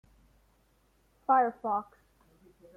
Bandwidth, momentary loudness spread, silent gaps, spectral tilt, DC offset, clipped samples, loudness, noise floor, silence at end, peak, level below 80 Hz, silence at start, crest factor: 3 kHz; 16 LU; none; -7.5 dB/octave; under 0.1%; under 0.1%; -29 LUFS; -68 dBFS; 0.95 s; -14 dBFS; -68 dBFS; 1.3 s; 20 dB